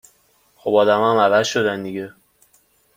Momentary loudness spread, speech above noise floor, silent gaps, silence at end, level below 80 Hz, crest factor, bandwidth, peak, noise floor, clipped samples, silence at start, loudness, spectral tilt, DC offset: 15 LU; 42 dB; none; 0.85 s; -64 dBFS; 18 dB; 16 kHz; -2 dBFS; -59 dBFS; under 0.1%; 0.65 s; -18 LUFS; -4.5 dB/octave; under 0.1%